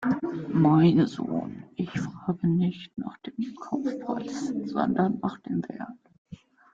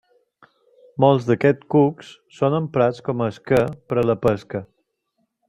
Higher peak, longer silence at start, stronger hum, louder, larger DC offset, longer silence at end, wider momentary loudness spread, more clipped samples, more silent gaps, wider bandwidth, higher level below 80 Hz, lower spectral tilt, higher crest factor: second, -10 dBFS vs -2 dBFS; second, 0 s vs 1 s; neither; second, -27 LUFS vs -20 LUFS; neither; second, 0.4 s vs 0.85 s; first, 16 LU vs 10 LU; neither; first, 6.18-6.25 s vs none; second, 7.6 kHz vs 13 kHz; second, -64 dBFS vs -54 dBFS; about the same, -8 dB/octave vs -8 dB/octave; about the same, 18 dB vs 18 dB